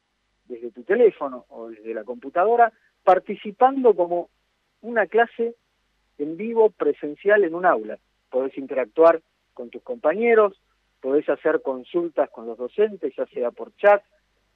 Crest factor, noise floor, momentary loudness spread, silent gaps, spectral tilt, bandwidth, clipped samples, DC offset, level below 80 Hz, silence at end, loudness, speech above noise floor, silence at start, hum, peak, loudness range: 18 dB; -69 dBFS; 18 LU; none; -7.5 dB/octave; 4.3 kHz; under 0.1%; under 0.1%; -72 dBFS; 0.55 s; -22 LUFS; 48 dB; 0.5 s; none; -4 dBFS; 3 LU